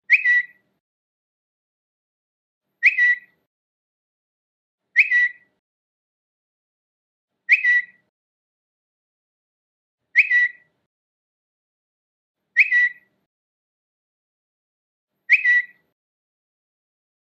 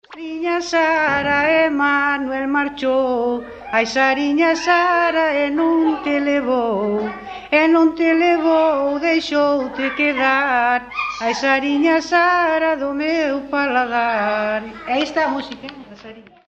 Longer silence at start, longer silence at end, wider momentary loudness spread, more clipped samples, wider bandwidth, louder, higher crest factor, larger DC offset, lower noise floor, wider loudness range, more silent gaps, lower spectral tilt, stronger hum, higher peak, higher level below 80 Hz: about the same, 0.1 s vs 0.1 s; first, 1.55 s vs 0.25 s; about the same, 8 LU vs 7 LU; neither; about the same, 8 kHz vs 8 kHz; about the same, -17 LUFS vs -17 LUFS; first, 22 dB vs 16 dB; neither; first, under -90 dBFS vs -40 dBFS; about the same, 3 LU vs 2 LU; first, 0.80-2.61 s, 3.47-4.78 s, 5.59-7.28 s, 8.09-9.98 s, 10.86-12.35 s, 13.26-15.08 s vs none; second, 3 dB/octave vs -4 dB/octave; neither; about the same, -4 dBFS vs -2 dBFS; second, under -90 dBFS vs -54 dBFS